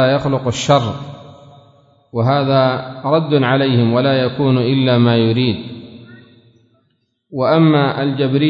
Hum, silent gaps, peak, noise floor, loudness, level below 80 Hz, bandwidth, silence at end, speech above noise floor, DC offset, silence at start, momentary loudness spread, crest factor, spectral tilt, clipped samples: none; none; 0 dBFS; -64 dBFS; -15 LUFS; -52 dBFS; 7.8 kHz; 0 s; 50 dB; under 0.1%; 0 s; 13 LU; 16 dB; -7 dB/octave; under 0.1%